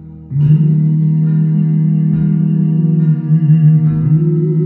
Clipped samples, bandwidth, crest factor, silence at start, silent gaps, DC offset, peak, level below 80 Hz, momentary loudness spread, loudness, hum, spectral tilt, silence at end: under 0.1%; 2.9 kHz; 10 dB; 0 s; none; under 0.1%; 0 dBFS; -44 dBFS; 4 LU; -12 LUFS; none; -14 dB/octave; 0 s